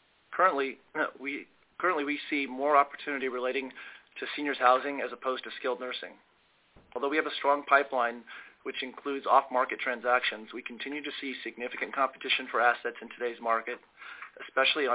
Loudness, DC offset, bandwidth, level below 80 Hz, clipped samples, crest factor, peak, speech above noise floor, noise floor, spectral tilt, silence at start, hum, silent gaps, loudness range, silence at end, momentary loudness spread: -30 LUFS; under 0.1%; 4 kHz; -76 dBFS; under 0.1%; 24 dB; -8 dBFS; 33 dB; -64 dBFS; 1 dB/octave; 0.3 s; none; none; 3 LU; 0 s; 16 LU